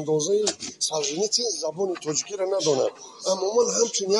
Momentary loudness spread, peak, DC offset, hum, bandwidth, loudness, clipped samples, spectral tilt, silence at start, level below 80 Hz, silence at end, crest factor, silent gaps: 6 LU; -8 dBFS; under 0.1%; none; 11.5 kHz; -24 LUFS; under 0.1%; -2.5 dB/octave; 0 s; -74 dBFS; 0 s; 16 dB; none